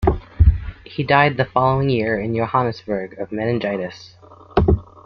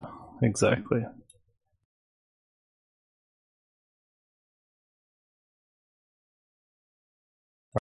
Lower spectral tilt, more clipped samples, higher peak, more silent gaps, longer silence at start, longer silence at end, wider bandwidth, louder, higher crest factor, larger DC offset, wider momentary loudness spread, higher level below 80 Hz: first, -8.5 dB/octave vs -6 dB/octave; neither; first, -2 dBFS vs -10 dBFS; second, none vs 1.85-7.72 s; about the same, 0 s vs 0 s; first, 0.2 s vs 0 s; second, 6.2 kHz vs 10.5 kHz; first, -19 LUFS vs -28 LUFS; second, 18 dB vs 26 dB; neither; second, 12 LU vs 16 LU; first, -28 dBFS vs -60 dBFS